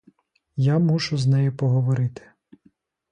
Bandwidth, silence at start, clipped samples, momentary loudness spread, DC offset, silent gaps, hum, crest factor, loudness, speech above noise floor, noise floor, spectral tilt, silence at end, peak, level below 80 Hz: 9.6 kHz; 0.55 s; under 0.1%; 6 LU; under 0.1%; none; none; 12 dB; -22 LUFS; 41 dB; -61 dBFS; -7.5 dB/octave; 1 s; -10 dBFS; -60 dBFS